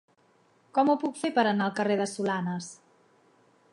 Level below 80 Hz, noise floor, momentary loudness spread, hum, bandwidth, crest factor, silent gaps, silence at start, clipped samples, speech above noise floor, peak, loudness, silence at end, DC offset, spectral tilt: -80 dBFS; -65 dBFS; 9 LU; none; 11.5 kHz; 18 dB; none; 0.75 s; under 0.1%; 38 dB; -10 dBFS; -28 LUFS; 1 s; under 0.1%; -5.5 dB/octave